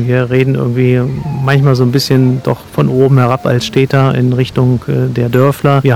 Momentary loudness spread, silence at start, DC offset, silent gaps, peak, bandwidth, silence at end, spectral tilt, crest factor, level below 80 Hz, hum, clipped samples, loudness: 5 LU; 0 s; under 0.1%; none; 0 dBFS; 14.5 kHz; 0 s; -7.5 dB/octave; 10 dB; -40 dBFS; none; 1%; -11 LUFS